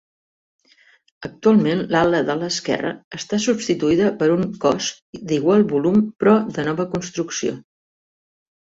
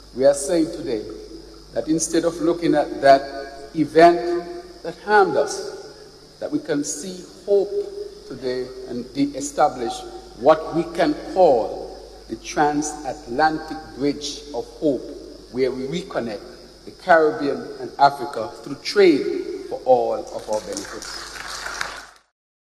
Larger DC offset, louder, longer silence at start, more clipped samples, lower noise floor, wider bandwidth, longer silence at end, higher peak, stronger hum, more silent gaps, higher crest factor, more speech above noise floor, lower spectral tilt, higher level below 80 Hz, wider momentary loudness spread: neither; about the same, -19 LUFS vs -21 LUFS; first, 1.2 s vs 0 s; neither; first, -55 dBFS vs -44 dBFS; second, 8 kHz vs 14 kHz; first, 1.05 s vs 0.55 s; about the same, -4 dBFS vs -2 dBFS; neither; first, 3.04-3.11 s, 5.02-5.13 s vs none; about the same, 16 dB vs 20 dB; first, 37 dB vs 23 dB; about the same, -5 dB/octave vs -4 dB/octave; second, -56 dBFS vs -50 dBFS; second, 10 LU vs 18 LU